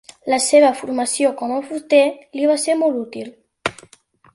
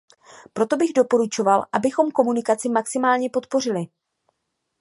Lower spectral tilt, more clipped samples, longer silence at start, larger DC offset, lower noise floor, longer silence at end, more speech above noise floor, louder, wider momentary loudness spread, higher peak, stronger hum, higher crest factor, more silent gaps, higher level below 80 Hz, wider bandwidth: second, -2.5 dB/octave vs -4.5 dB/octave; neither; second, 0.25 s vs 0.55 s; neither; second, -52 dBFS vs -77 dBFS; second, 0.6 s vs 0.95 s; second, 35 dB vs 56 dB; first, -18 LUFS vs -21 LUFS; first, 13 LU vs 7 LU; about the same, -2 dBFS vs -2 dBFS; neither; about the same, 16 dB vs 20 dB; neither; first, -62 dBFS vs -70 dBFS; about the same, 11.5 kHz vs 11.5 kHz